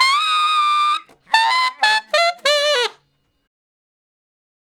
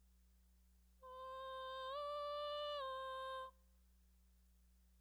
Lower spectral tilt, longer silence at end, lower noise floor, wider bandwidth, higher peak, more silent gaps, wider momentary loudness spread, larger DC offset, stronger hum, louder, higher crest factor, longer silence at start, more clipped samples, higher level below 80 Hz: second, 2.5 dB/octave vs -2.5 dB/octave; first, 1.9 s vs 0 s; second, -64 dBFS vs -71 dBFS; second, 17.5 kHz vs over 20 kHz; first, 0 dBFS vs -36 dBFS; neither; second, 5 LU vs 11 LU; neither; second, none vs 60 Hz at -70 dBFS; first, -16 LUFS vs -47 LUFS; about the same, 18 dB vs 14 dB; about the same, 0 s vs 0 s; neither; about the same, -74 dBFS vs -72 dBFS